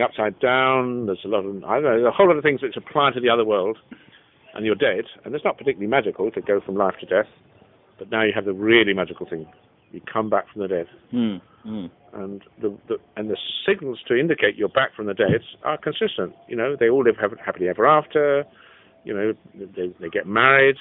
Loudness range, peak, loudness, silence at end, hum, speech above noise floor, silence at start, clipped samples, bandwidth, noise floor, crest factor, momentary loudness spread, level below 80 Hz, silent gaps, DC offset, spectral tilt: 7 LU; -2 dBFS; -21 LUFS; 0 s; none; 33 dB; 0 s; under 0.1%; 4 kHz; -54 dBFS; 20 dB; 15 LU; -62 dBFS; none; under 0.1%; -9 dB/octave